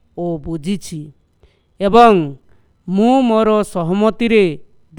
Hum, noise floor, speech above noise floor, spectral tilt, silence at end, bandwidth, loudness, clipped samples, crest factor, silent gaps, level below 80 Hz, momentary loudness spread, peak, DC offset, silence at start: none; -54 dBFS; 40 dB; -6.5 dB/octave; 0.35 s; 16 kHz; -14 LUFS; under 0.1%; 16 dB; none; -44 dBFS; 17 LU; 0 dBFS; under 0.1%; 0.15 s